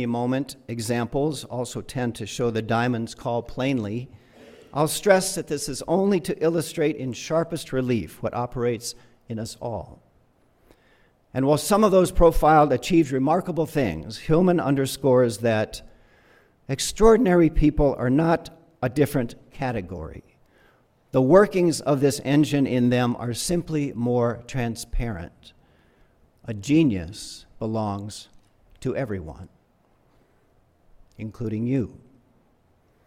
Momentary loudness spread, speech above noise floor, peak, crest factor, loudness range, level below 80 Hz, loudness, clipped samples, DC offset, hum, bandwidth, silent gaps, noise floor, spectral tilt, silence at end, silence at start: 16 LU; 40 dB; -2 dBFS; 20 dB; 12 LU; -38 dBFS; -23 LUFS; under 0.1%; under 0.1%; none; 16.5 kHz; none; -62 dBFS; -6 dB/octave; 1.15 s; 0 s